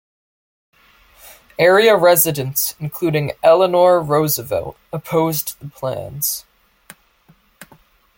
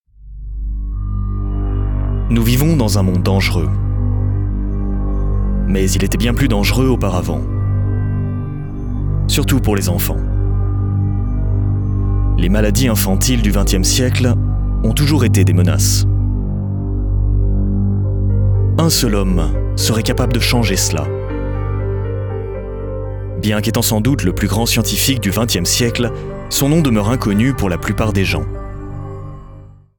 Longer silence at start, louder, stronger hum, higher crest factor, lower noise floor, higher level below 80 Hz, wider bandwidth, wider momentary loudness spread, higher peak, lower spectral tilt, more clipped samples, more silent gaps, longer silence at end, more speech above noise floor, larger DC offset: first, 1.25 s vs 0.2 s; about the same, -16 LUFS vs -16 LUFS; second, none vs 50 Hz at -25 dBFS; first, 18 dB vs 12 dB; first, -55 dBFS vs -38 dBFS; second, -54 dBFS vs -20 dBFS; second, 17 kHz vs over 20 kHz; first, 16 LU vs 10 LU; about the same, 0 dBFS vs -2 dBFS; about the same, -4 dB/octave vs -5 dB/octave; neither; neither; first, 0.55 s vs 0.3 s; first, 39 dB vs 24 dB; neither